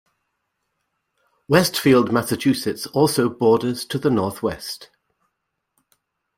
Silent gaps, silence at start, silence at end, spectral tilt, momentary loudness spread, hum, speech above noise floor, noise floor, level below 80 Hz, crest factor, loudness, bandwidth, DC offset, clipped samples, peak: none; 1.5 s; 1.55 s; -5 dB/octave; 10 LU; none; 58 dB; -77 dBFS; -56 dBFS; 20 dB; -20 LUFS; 16.5 kHz; under 0.1%; under 0.1%; -2 dBFS